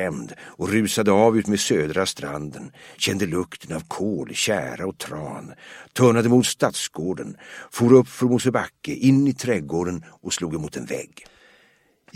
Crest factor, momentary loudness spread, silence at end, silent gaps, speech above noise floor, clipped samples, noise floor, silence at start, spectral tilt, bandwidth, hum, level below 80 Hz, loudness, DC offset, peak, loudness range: 20 dB; 17 LU; 1.1 s; none; 38 dB; under 0.1%; -60 dBFS; 0 s; -5 dB/octave; 16 kHz; none; -56 dBFS; -22 LUFS; under 0.1%; -2 dBFS; 6 LU